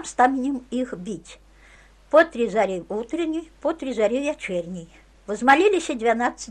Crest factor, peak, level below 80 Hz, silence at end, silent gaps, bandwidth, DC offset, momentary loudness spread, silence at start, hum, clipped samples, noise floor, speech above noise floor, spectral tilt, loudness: 20 dB; -4 dBFS; -54 dBFS; 0 s; none; 11.5 kHz; under 0.1%; 15 LU; 0 s; none; under 0.1%; -51 dBFS; 29 dB; -4.5 dB/octave; -22 LUFS